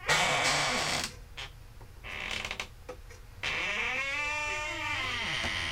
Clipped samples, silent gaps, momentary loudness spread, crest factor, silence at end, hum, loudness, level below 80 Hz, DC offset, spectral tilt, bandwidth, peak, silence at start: under 0.1%; none; 19 LU; 20 dB; 0 s; none; -30 LUFS; -50 dBFS; under 0.1%; -1.5 dB/octave; 17 kHz; -14 dBFS; 0 s